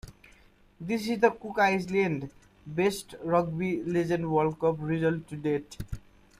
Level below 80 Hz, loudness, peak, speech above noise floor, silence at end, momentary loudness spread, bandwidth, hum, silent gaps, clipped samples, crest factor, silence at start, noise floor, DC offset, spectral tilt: -52 dBFS; -28 LUFS; -8 dBFS; 31 dB; 0.4 s; 14 LU; 15 kHz; none; none; under 0.1%; 20 dB; 0.05 s; -59 dBFS; under 0.1%; -6.5 dB/octave